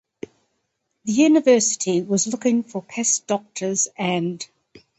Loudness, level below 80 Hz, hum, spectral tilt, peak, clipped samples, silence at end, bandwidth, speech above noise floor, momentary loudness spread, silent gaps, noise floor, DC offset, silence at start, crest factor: -20 LUFS; -68 dBFS; none; -3.5 dB/octave; -4 dBFS; under 0.1%; 0.55 s; 8.8 kHz; 54 dB; 19 LU; none; -74 dBFS; under 0.1%; 1.05 s; 18 dB